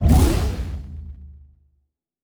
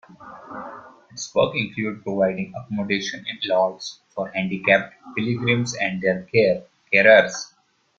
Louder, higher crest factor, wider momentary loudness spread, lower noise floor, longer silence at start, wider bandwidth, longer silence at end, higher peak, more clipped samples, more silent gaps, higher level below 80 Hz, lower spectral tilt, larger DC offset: about the same, -21 LUFS vs -21 LUFS; about the same, 18 dB vs 22 dB; first, 23 LU vs 19 LU; first, -69 dBFS vs -41 dBFS; second, 0 s vs 0.2 s; first, over 20 kHz vs 7.6 kHz; first, 0.85 s vs 0.55 s; about the same, -4 dBFS vs -2 dBFS; neither; neither; first, -24 dBFS vs -60 dBFS; first, -6.5 dB/octave vs -4.5 dB/octave; neither